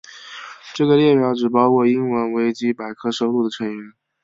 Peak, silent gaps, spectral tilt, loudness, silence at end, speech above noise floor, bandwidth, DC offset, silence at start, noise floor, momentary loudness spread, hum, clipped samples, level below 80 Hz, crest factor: -2 dBFS; none; -6.5 dB/octave; -18 LUFS; 0.35 s; 19 dB; 7.8 kHz; under 0.1%; 0.1 s; -37 dBFS; 19 LU; none; under 0.1%; -64 dBFS; 16 dB